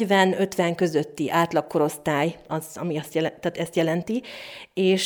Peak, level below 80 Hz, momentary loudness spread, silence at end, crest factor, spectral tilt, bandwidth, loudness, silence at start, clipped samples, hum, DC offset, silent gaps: -6 dBFS; -64 dBFS; 9 LU; 0 s; 18 dB; -5.5 dB/octave; over 20 kHz; -24 LUFS; 0 s; under 0.1%; none; under 0.1%; none